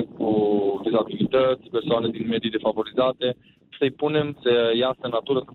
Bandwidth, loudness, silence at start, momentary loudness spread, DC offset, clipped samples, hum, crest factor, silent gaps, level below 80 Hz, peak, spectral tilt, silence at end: 4.4 kHz; -23 LUFS; 0 s; 6 LU; under 0.1%; under 0.1%; none; 12 dB; none; -60 dBFS; -10 dBFS; -9 dB/octave; 0.1 s